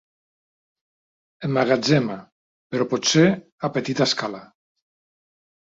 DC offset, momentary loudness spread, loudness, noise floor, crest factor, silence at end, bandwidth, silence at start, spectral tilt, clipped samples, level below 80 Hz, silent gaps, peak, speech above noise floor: under 0.1%; 14 LU; -21 LUFS; under -90 dBFS; 20 dB; 1.35 s; 8 kHz; 1.4 s; -4.5 dB/octave; under 0.1%; -64 dBFS; 2.32-2.70 s, 3.52-3.58 s; -4 dBFS; over 69 dB